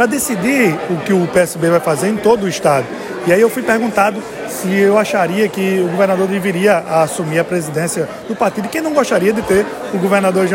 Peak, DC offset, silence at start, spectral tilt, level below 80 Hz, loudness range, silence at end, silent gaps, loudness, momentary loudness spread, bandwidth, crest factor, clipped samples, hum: 0 dBFS; under 0.1%; 0 s; -5 dB/octave; -50 dBFS; 2 LU; 0 s; none; -15 LUFS; 6 LU; 17 kHz; 14 dB; under 0.1%; none